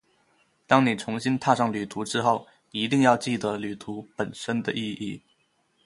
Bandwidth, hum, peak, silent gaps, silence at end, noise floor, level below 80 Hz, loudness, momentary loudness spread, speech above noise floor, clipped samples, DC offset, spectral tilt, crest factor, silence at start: 11.5 kHz; none; -2 dBFS; none; 0.65 s; -69 dBFS; -66 dBFS; -26 LUFS; 14 LU; 43 dB; under 0.1%; under 0.1%; -5 dB/octave; 24 dB; 0.7 s